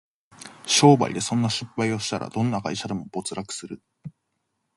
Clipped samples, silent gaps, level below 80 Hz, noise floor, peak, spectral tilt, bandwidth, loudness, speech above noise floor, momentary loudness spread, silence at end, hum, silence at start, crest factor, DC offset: under 0.1%; none; -60 dBFS; -76 dBFS; -2 dBFS; -4.5 dB/octave; 11.5 kHz; -23 LUFS; 53 dB; 26 LU; 0.7 s; none; 0.4 s; 22 dB; under 0.1%